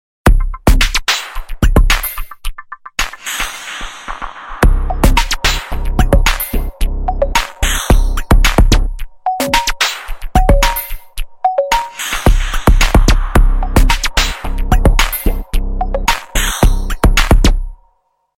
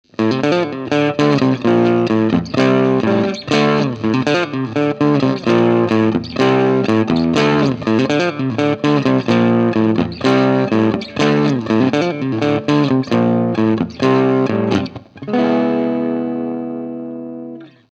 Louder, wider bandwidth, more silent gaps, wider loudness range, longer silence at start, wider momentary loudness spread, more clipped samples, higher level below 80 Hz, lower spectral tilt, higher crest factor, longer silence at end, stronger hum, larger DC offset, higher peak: about the same, -15 LUFS vs -15 LUFS; first, 16.5 kHz vs 8.2 kHz; neither; about the same, 3 LU vs 2 LU; about the same, 0.25 s vs 0.2 s; first, 13 LU vs 6 LU; neither; first, -14 dBFS vs -50 dBFS; second, -4 dB/octave vs -7 dB/octave; about the same, 12 dB vs 16 dB; first, 0.6 s vs 0.25 s; neither; neither; about the same, 0 dBFS vs 0 dBFS